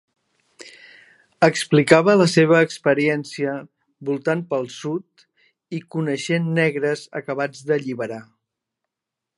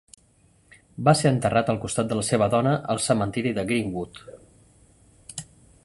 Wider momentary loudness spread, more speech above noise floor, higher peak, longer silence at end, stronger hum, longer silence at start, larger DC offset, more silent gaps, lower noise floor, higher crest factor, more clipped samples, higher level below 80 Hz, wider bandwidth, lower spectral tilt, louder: about the same, 16 LU vs 18 LU; first, 65 dB vs 37 dB; first, 0 dBFS vs -4 dBFS; first, 1.15 s vs 0.4 s; neither; second, 0.65 s vs 1 s; neither; neither; first, -85 dBFS vs -60 dBFS; about the same, 22 dB vs 22 dB; neither; second, -68 dBFS vs -54 dBFS; about the same, 11.5 kHz vs 11.5 kHz; about the same, -5.5 dB/octave vs -5.5 dB/octave; first, -20 LUFS vs -23 LUFS